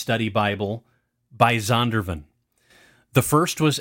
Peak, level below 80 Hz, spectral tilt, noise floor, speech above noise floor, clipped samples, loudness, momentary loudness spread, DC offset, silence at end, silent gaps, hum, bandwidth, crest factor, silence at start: -2 dBFS; -50 dBFS; -5 dB/octave; -59 dBFS; 38 dB; under 0.1%; -22 LUFS; 12 LU; under 0.1%; 0 s; none; none; 17 kHz; 22 dB; 0 s